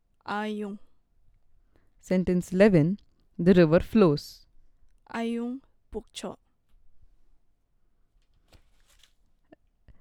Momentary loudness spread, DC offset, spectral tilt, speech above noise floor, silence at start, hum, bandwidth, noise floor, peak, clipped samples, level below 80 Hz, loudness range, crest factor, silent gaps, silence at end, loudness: 21 LU; under 0.1%; -7.5 dB/octave; 42 dB; 0.3 s; none; 13.5 kHz; -66 dBFS; -6 dBFS; under 0.1%; -50 dBFS; 17 LU; 22 dB; none; 3.05 s; -25 LUFS